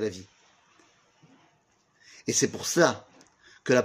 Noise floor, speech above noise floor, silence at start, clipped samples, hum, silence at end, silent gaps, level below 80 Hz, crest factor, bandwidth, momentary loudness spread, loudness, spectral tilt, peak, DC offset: -67 dBFS; 41 dB; 0 s; under 0.1%; none; 0 s; none; -72 dBFS; 26 dB; 15.5 kHz; 17 LU; -26 LUFS; -3.5 dB/octave; -4 dBFS; under 0.1%